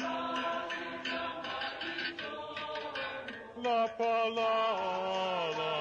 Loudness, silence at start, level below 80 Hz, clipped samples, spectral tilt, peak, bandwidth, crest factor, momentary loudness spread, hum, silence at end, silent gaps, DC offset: -34 LUFS; 0 s; -72 dBFS; under 0.1%; -4 dB/octave; -22 dBFS; 8.6 kHz; 12 dB; 9 LU; none; 0 s; none; under 0.1%